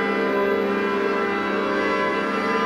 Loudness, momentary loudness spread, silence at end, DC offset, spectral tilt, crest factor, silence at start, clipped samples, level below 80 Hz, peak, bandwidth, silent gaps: -22 LUFS; 1 LU; 0 s; under 0.1%; -5.5 dB/octave; 12 dB; 0 s; under 0.1%; -56 dBFS; -10 dBFS; 12.5 kHz; none